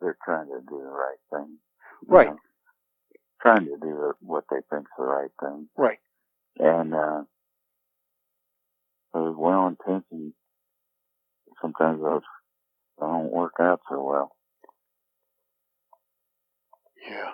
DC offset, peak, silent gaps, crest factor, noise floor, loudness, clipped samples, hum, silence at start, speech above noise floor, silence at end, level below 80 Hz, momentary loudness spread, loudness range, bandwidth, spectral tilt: under 0.1%; 0 dBFS; none; 28 dB; -80 dBFS; -25 LUFS; under 0.1%; none; 0 s; 56 dB; 0 s; -66 dBFS; 17 LU; 7 LU; 5.2 kHz; -9.5 dB/octave